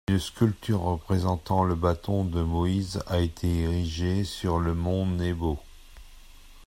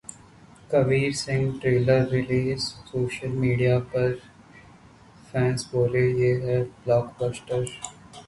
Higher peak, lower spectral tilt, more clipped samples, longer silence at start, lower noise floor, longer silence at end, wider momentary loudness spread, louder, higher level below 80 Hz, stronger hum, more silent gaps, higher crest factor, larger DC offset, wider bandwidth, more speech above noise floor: about the same, -8 dBFS vs -8 dBFS; about the same, -7 dB/octave vs -6.5 dB/octave; neither; about the same, 0.1 s vs 0.1 s; about the same, -48 dBFS vs -51 dBFS; about the same, 0.05 s vs 0.05 s; second, 3 LU vs 9 LU; about the same, -27 LUFS vs -25 LUFS; first, -42 dBFS vs -52 dBFS; neither; neither; about the same, 18 dB vs 18 dB; neither; first, 16 kHz vs 11.5 kHz; second, 22 dB vs 27 dB